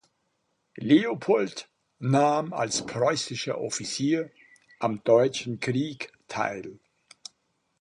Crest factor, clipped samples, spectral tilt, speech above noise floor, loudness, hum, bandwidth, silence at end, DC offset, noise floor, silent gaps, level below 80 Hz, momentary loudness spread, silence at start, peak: 20 dB; under 0.1%; -5 dB/octave; 49 dB; -26 LUFS; none; 11 kHz; 1.05 s; under 0.1%; -75 dBFS; none; -68 dBFS; 18 LU; 0.75 s; -8 dBFS